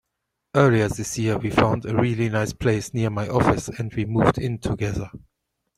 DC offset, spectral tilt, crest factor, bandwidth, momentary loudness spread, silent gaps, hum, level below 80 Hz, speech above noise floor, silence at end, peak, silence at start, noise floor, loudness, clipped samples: under 0.1%; -6.5 dB/octave; 20 dB; 13.5 kHz; 8 LU; none; none; -44 dBFS; 58 dB; 0.6 s; -2 dBFS; 0.55 s; -80 dBFS; -22 LUFS; under 0.1%